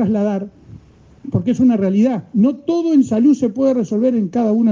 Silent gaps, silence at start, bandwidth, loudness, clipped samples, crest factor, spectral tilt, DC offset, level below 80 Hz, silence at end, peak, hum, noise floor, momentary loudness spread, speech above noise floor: none; 0 s; 7.4 kHz; -16 LUFS; under 0.1%; 12 dB; -8.5 dB/octave; under 0.1%; -54 dBFS; 0 s; -4 dBFS; none; -43 dBFS; 7 LU; 28 dB